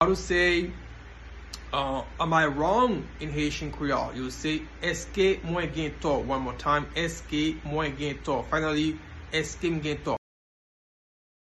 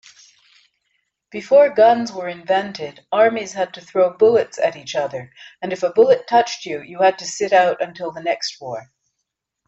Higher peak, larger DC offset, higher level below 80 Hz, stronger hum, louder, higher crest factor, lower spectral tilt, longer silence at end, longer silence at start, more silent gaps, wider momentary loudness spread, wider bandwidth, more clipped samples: second, -8 dBFS vs -2 dBFS; neither; first, -44 dBFS vs -66 dBFS; neither; second, -28 LUFS vs -18 LUFS; about the same, 20 dB vs 16 dB; first, -5 dB/octave vs -3.5 dB/octave; first, 1.35 s vs 0.85 s; second, 0 s vs 1.35 s; neither; second, 10 LU vs 16 LU; first, 12 kHz vs 8 kHz; neither